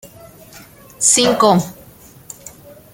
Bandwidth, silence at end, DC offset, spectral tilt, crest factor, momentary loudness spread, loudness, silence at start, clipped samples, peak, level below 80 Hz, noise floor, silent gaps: 17 kHz; 1.2 s; under 0.1%; -3 dB/octave; 18 dB; 24 LU; -13 LUFS; 0.05 s; under 0.1%; 0 dBFS; -52 dBFS; -43 dBFS; none